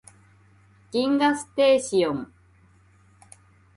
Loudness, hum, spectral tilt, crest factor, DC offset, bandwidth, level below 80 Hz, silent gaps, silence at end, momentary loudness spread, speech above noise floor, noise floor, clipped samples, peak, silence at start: -23 LUFS; none; -4 dB/octave; 18 dB; under 0.1%; 11.5 kHz; -64 dBFS; none; 1.5 s; 12 LU; 35 dB; -57 dBFS; under 0.1%; -8 dBFS; 0.95 s